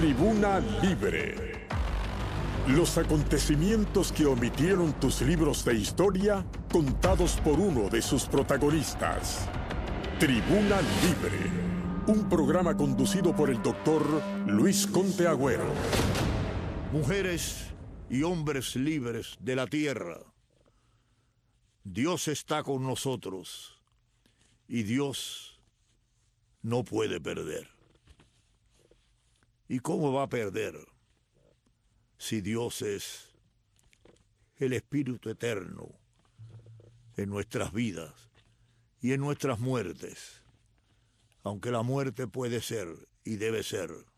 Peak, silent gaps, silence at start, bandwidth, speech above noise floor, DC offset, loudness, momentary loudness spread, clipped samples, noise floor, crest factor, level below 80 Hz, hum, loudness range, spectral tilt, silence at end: -10 dBFS; none; 0 s; 14.5 kHz; 42 dB; under 0.1%; -29 LUFS; 13 LU; under 0.1%; -70 dBFS; 20 dB; -42 dBFS; none; 11 LU; -5.5 dB/octave; 0.15 s